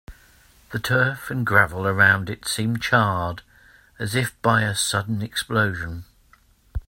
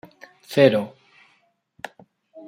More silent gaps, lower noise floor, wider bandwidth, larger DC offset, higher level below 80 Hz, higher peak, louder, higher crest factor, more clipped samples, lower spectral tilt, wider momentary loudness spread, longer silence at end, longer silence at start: neither; second, -57 dBFS vs -65 dBFS; about the same, 16.5 kHz vs 16 kHz; neither; first, -46 dBFS vs -70 dBFS; about the same, 0 dBFS vs -2 dBFS; about the same, -21 LUFS vs -19 LUFS; about the same, 22 dB vs 22 dB; neither; second, -4 dB/octave vs -6.5 dB/octave; second, 15 LU vs 22 LU; about the same, 0.05 s vs 0.1 s; second, 0.1 s vs 0.5 s